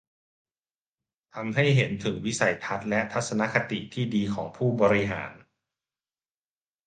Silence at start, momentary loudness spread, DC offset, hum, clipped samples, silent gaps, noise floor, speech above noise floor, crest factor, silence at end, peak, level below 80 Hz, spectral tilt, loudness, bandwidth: 1.35 s; 9 LU; under 0.1%; none; under 0.1%; none; under -90 dBFS; over 64 dB; 22 dB; 1.5 s; -6 dBFS; -58 dBFS; -5.5 dB/octave; -26 LUFS; 9.6 kHz